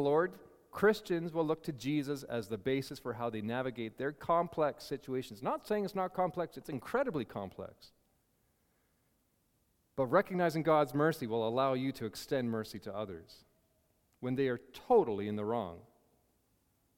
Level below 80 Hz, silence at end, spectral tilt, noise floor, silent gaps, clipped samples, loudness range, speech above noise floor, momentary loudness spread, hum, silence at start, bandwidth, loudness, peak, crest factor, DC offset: -70 dBFS; 1.15 s; -6.5 dB/octave; -76 dBFS; none; under 0.1%; 7 LU; 41 dB; 13 LU; none; 0 s; 17 kHz; -35 LUFS; -14 dBFS; 22 dB; under 0.1%